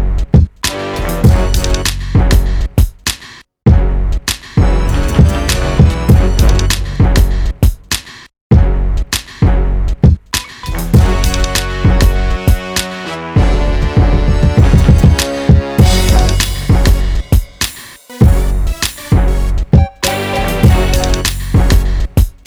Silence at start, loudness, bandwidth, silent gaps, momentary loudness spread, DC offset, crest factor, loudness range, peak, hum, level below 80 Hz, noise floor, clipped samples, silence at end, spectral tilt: 0 s; -13 LUFS; over 20 kHz; 8.41-8.50 s; 8 LU; under 0.1%; 10 dB; 3 LU; 0 dBFS; none; -14 dBFS; -36 dBFS; 0.6%; 0.15 s; -5.5 dB/octave